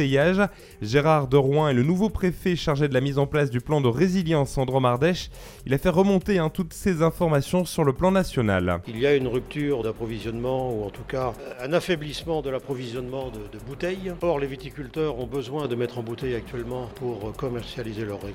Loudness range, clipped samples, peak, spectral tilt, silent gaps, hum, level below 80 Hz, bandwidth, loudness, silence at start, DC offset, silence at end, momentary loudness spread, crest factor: 7 LU; under 0.1%; -6 dBFS; -6.5 dB/octave; none; none; -44 dBFS; 17 kHz; -25 LUFS; 0 s; under 0.1%; 0 s; 11 LU; 20 dB